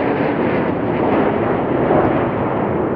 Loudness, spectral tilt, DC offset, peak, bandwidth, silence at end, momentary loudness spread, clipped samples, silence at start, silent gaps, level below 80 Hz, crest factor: -17 LUFS; -11 dB/octave; under 0.1%; 0 dBFS; 5.2 kHz; 0 s; 4 LU; under 0.1%; 0 s; none; -40 dBFS; 16 dB